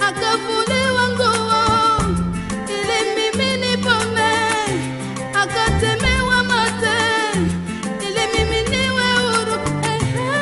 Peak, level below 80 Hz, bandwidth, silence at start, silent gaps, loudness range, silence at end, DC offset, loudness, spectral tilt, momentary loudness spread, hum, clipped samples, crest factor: -2 dBFS; -34 dBFS; 11.5 kHz; 0 s; none; 1 LU; 0 s; under 0.1%; -18 LUFS; -4 dB/octave; 7 LU; none; under 0.1%; 16 dB